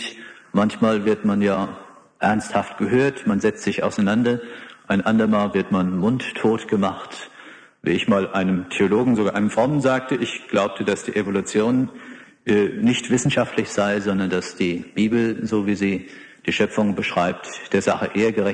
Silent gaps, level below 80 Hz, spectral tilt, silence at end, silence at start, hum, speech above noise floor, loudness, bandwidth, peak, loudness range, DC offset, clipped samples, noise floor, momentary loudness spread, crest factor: none; -56 dBFS; -5.5 dB/octave; 0 s; 0 s; none; 24 dB; -21 LUFS; 10 kHz; -4 dBFS; 2 LU; under 0.1%; under 0.1%; -44 dBFS; 9 LU; 16 dB